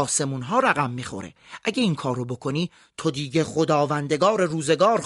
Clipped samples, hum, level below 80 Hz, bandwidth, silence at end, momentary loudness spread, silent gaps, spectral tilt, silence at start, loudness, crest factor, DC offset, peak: under 0.1%; none; -62 dBFS; 11.5 kHz; 0 s; 10 LU; none; -4.5 dB/octave; 0 s; -23 LUFS; 20 dB; under 0.1%; -4 dBFS